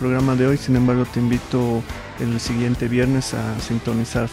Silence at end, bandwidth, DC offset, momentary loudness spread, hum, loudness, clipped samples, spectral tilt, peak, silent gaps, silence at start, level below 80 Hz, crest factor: 0 s; 15.5 kHz; under 0.1%; 7 LU; none; -20 LUFS; under 0.1%; -6.5 dB/octave; -4 dBFS; none; 0 s; -38 dBFS; 14 dB